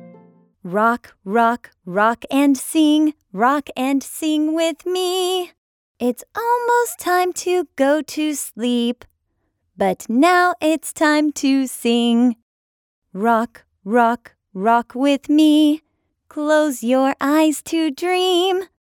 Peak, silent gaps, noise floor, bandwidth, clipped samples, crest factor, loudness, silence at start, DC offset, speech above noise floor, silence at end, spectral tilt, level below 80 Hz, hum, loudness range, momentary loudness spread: -2 dBFS; 5.58-5.95 s, 12.42-13.02 s; -70 dBFS; 18.5 kHz; under 0.1%; 16 dB; -18 LUFS; 0 s; under 0.1%; 53 dB; 0.25 s; -3.5 dB/octave; -64 dBFS; none; 3 LU; 9 LU